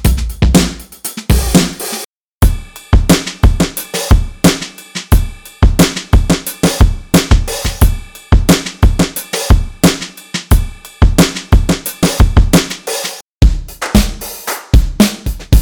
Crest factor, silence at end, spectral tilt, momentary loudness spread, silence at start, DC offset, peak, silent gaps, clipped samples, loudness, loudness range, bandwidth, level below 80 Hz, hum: 12 dB; 0 s; -5 dB/octave; 11 LU; 0 s; under 0.1%; 0 dBFS; 2.05-2.41 s, 13.22-13.40 s; under 0.1%; -13 LUFS; 1 LU; over 20 kHz; -14 dBFS; none